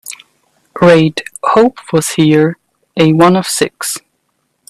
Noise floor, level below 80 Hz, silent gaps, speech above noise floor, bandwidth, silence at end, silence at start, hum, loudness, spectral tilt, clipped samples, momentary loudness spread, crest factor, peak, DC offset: -64 dBFS; -52 dBFS; none; 54 dB; 15 kHz; 0.7 s; 0.05 s; none; -11 LUFS; -5 dB/octave; under 0.1%; 18 LU; 12 dB; 0 dBFS; under 0.1%